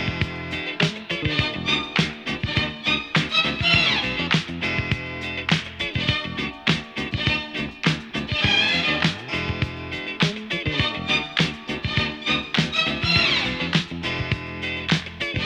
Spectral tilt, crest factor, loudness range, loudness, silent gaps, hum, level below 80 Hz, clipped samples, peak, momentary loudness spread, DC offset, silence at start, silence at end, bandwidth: -4.5 dB/octave; 20 dB; 3 LU; -22 LUFS; none; none; -42 dBFS; under 0.1%; -4 dBFS; 9 LU; under 0.1%; 0 s; 0 s; 10.5 kHz